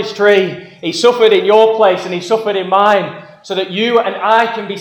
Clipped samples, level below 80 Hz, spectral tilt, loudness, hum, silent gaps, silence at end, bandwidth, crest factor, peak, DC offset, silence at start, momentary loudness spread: under 0.1%; -64 dBFS; -4.5 dB/octave; -12 LUFS; none; none; 0 s; 11.5 kHz; 12 dB; 0 dBFS; under 0.1%; 0 s; 12 LU